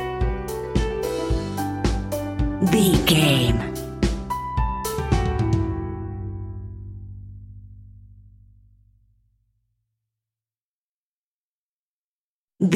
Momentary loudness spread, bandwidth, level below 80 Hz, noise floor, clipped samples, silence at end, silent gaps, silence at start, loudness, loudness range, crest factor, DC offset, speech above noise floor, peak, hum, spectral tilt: 21 LU; 16.5 kHz; -32 dBFS; under -90 dBFS; under 0.1%; 0 s; 10.63-12.48 s; 0 s; -23 LUFS; 18 LU; 20 dB; under 0.1%; over 72 dB; -4 dBFS; none; -5.5 dB/octave